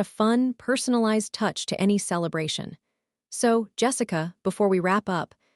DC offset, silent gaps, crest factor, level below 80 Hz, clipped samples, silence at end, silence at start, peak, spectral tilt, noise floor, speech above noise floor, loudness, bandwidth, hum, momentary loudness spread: under 0.1%; none; 16 dB; -68 dBFS; under 0.1%; 0.3 s; 0 s; -10 dBFS; -4.5 dB/octave; -75 dBFS; 50 dB; -25 LUFS; 13.5 kHz; none; 7 LU